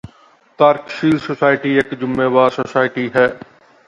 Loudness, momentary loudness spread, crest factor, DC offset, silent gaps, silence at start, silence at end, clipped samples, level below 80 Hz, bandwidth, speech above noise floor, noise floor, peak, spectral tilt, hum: -16 LUFS; 4 LU; 16 dB; under 0.1%; none; 0.6 s; 0.5 s; under 0.1%; -54 dBFS; 10 kHz; 35 dB; -50 dBFS; 0 dBFS; -7 dB/octave; none